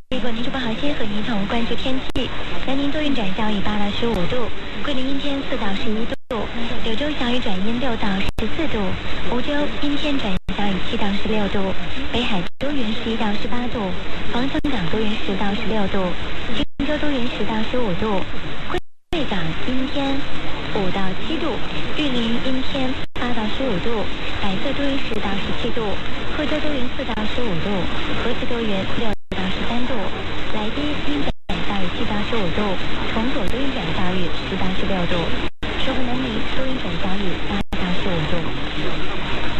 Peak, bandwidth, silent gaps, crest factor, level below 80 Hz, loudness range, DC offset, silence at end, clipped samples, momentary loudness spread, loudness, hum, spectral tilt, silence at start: -6 dBFS; 8.8 kHz; none; 10 dB; -34 dBFS; 1 LU; under 0.1%; 0 s; under 0.1%; 4 LU; -24 LUFS; none; -6 dB/octave; 0 s